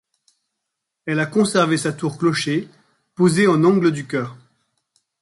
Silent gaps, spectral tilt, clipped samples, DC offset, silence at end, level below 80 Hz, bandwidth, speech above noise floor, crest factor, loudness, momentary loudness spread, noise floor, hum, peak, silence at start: none; -5.5 dB/octave; under 0.1%; under 0.1%; 0.85 s; -62 dBFS; 11.5 kHz; 62 dB; 16 dB; -19 LUFS; 11 LU; -80 dBFS; none; -4 dBFS; 1.05 s